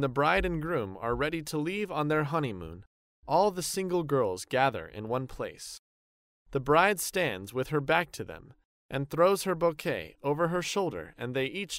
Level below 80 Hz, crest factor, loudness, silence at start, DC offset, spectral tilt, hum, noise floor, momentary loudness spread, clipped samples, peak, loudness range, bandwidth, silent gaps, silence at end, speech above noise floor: -52 dBFS; 20 dB; -30 LUFS; 0 s; under 0.1%; -5 dB/octave; none; under -90 dBFS; 13 LU; under 0.1%; -10 dBFS; 2 LU; 16 kHz; 2.87-3.23 s, 5.79-6.46 s, 8.65-8.89 s; 0 s; over 60 dB